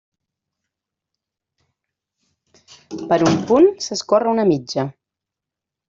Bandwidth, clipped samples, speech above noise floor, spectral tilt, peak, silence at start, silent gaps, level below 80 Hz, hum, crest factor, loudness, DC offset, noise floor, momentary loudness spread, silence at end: 7.8 kHz; under 0.1%; 69 dB; -5.5 dB/octave; -2 dBFS; 2.9 s; none; -62 dBFS; none; 18 dB; -17 LUFS; under 0.1%; -85 dBFS; 14 LU; 1 s